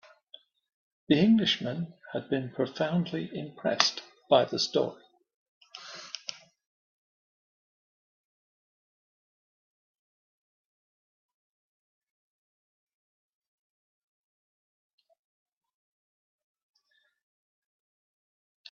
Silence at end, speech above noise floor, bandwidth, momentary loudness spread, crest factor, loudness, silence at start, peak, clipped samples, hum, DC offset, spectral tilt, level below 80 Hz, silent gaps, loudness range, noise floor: 12.4 s; 45 dB; 7.2 kHz; 18 LU; 30 dB; -28 LUFS; 1.1 s; -4 dBFS; under 0.1%; none; under 0.1%; -4 dB/octave; -74 dBFS; 5.36-5.61 s; 18 LU; -73 dBFS